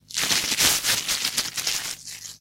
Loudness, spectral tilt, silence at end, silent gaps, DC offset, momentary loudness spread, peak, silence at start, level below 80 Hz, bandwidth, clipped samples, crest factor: -22 LUFS; 0.5 dB/octave; 0.05 s; none; under 0.1%; 13 LU; -4 dBFS; 0.1 s; -56 dBFS; 17 kHz; under 0.1%; 22 dB